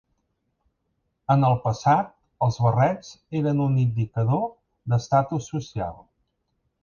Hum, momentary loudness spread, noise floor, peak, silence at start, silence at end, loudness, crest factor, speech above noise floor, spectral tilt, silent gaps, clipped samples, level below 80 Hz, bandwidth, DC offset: none; 12 LU; -75 dBFS; -6 dBFS; 1.3 s; 0.9 s; -24 LUFS; 18 dB; 52 dB; -8 dB/octave; none; under 0.1%; -54 dBFS; 7 kHz; under 0.1%